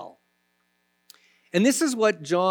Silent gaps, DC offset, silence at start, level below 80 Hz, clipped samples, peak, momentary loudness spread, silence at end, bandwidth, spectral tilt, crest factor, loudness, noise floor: none; under 0.1%; 0 s; -84 dBFS; under 0.1%; -8 dBFS; 7 LU; 0 s; over 20 kHz; -4 dB/octave; 18 dB; -23 LUFS; -71 dBFS